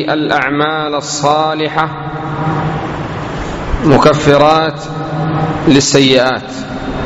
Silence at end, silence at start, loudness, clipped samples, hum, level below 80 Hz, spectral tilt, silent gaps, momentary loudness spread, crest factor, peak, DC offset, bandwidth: 0 s; 0 s; -13 LUFS; 0.3%; none; -32 dBFS; -5 dB/octave; none; 13 LU; 12 dB; 0 dBFS; under 0.1%; 8.6 kHz